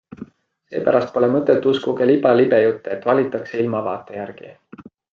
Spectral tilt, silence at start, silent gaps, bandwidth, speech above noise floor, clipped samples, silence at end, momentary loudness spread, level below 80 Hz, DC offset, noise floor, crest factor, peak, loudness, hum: -8 dB/octave; 0.2 s; none; 7 kHz; 22 dB; under 0.1%; 0.3 s; 17 LU; -64 dBFS; under 0.1%; -40 dBFS; 16 dB; -2 dBFS; -18 LUFS; none